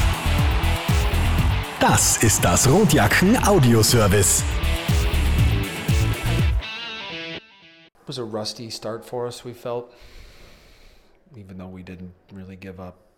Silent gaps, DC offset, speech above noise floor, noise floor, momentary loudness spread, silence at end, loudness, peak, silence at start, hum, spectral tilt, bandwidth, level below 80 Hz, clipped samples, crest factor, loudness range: none; under 0.1%; 31 dB; -51 dBFS; 22 LU; 0.25 s; -20 LUFS; -8 dBFS; 0 s; none; -4 dB/octave; over 20 kHz; -28 dBFS; under 0.1%; 14 dB; 18 LU